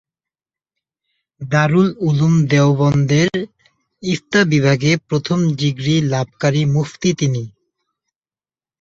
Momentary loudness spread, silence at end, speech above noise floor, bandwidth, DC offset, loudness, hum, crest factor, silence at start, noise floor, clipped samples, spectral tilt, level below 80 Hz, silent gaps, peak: 9 LU; 1.3 s; over 75 dB; 7.6 kHz; under 0.1%; -16 LUFS; none; 16 dB; 1.4 s; under -90 dBFS; under 0.1%; -6 dB/octave; -52 dBFS; none; -2 dBFS